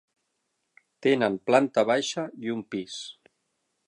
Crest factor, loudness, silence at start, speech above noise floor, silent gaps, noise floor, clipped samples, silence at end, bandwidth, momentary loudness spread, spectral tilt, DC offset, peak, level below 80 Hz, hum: 24 dB; -26 LUFS; 1 s; 52 dB; none; -78 dBFS; under 0.1%; 0.75 s; 11 kHz; 14 LU; -4.5 dB/octave; under 0.1%; -4 dBFS; -76 dBFS; none